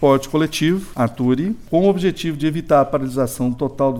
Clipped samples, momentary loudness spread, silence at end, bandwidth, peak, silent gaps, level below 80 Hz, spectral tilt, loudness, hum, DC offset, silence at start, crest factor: under 0.1%; 6 LU; 0 s; 17 kHz; -2 dBFS; none; -42 dBFS; -6.5 dB/octave; -19 LUFS; none; under 0.1%; 0 s; 16 dB